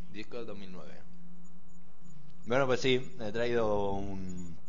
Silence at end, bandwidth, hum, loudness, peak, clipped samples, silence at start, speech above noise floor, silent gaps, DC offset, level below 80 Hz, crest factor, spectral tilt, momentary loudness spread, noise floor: 0.1 s; 7.6 kHz; none; -33 LUFS; -14 dBFS; under 0.1%; 0 s; 25 dB; none; 3%; -56 dBFS; 20 dB; -5.5 dB/octave; 21 LU; -58 dBFS